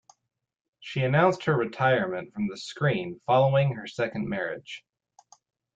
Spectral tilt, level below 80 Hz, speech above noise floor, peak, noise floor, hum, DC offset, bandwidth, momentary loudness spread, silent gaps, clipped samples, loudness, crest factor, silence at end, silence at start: -7 dB/octave; -64 dBFS; 33 dB; -8 dBFS; -59 dBFS; none; under 0.1%; 7.8 kHz; 12 LU; none; under 0.1%; -26 LUFS; 18 dB; 1 s; 0.8 s